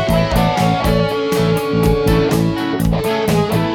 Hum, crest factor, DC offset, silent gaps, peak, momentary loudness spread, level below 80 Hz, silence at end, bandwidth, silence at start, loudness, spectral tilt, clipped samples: none; 12 dB; under 0.1%; none; -2 dBFS; 3 LU; -26 dBFS; 0 s; 17.5 kHz; 0 s; -16 LUFS; -6.5 dB/octave; under 0.1%